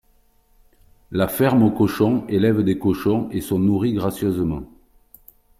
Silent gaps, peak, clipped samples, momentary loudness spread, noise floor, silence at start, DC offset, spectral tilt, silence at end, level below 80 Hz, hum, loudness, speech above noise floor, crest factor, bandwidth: none; -4 dBFS; under 0.1%; 7 LU; -58 dBFS; 1.1 s; under 0.1%; -7.5 dB/octave; 0.95 s; -48 dBFS; none; -20 LUFS; 39 dB; 18 dB; 16 kHz